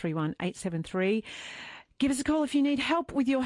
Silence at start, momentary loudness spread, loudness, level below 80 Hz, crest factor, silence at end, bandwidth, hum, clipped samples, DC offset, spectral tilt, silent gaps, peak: 0 s; 14 LU; -29 LUFS; -58 dBFS; 14 dB; 0 s; 11.5 kHz; none; under 0.1%; under 0.1%; -5.5 dB/octave; none; -16 dBFS